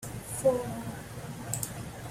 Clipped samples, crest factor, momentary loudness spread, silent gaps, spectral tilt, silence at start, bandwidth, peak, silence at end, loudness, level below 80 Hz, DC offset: under 0.1%; 20 dB; 13 LU; none; -5 dB/octave; 0 s; 16 kHz; -12 dBFS; 0 s; -33 LUFS; -54 dBFS; under 0.1%